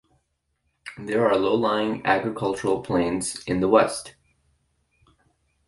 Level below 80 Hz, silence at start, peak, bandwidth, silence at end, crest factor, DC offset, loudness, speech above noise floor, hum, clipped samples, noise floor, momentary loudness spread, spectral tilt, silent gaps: -54 dBFS; 0.85 s; -2 dBFS; 11.5 kHz; 1.6 s; 22 dB; under 0.1%; -23 LUFS; 51 dB; none; under 0.1%; -74 dBFS; 16 LU; -5 dB/octave; none